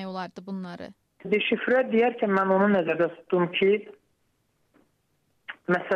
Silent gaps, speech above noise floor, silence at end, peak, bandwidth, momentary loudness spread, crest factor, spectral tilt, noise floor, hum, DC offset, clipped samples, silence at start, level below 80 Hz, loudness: none; 47 dB; 0 s; -12 dBFS; 6.8 kHz; 20 LU; 14 dB; -7.5 dB/octave; -71 dBFS; none; under 0.1%; under 0.1%; 0 s; -70 dBFS; -24 LUFS